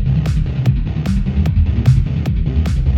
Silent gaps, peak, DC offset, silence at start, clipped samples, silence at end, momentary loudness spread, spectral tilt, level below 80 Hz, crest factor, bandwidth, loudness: none; 0 dBFS; under 0.1%; 0 s; under 0.1%; 0 s; 4 LU; -8.5 dB/octave; -18 dBFS; 14 dB; 8.6 kHz; -17 LUFS